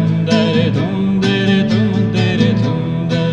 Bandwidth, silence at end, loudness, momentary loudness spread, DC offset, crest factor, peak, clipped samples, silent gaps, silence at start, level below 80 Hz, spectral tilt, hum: 8.8 kHz; 0 s; -15 LUFS; 3 LU; under 0.1%; 14 dB; 0 dBFS; under 0.1%; none; 0 s; -42 dBFS; -7 dB/octave; none